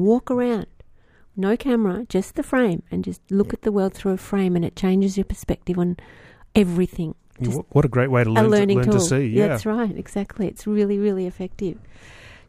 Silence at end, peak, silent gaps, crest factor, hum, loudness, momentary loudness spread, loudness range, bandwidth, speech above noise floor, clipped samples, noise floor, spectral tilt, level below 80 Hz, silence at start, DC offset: 0.15 s; -4 dBFS; none; 18 dB; none; -22 LUFS; 11 LU; 4 LU; 15.5 kHz; 30 dB; under 0.1%; -51 dBFS; -7 dB/octave; -42 dBFS; 0 s; under 0.1%